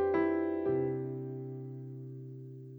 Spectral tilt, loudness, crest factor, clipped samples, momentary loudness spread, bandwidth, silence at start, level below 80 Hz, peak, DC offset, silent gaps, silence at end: -11 dB/octave; -35 LUFS; 16 dB; under 0.1%; 15 LU; 4.6 kHz; 0 s; -68 dBFS; -18 dBFS; under 0.1%; none; 0 s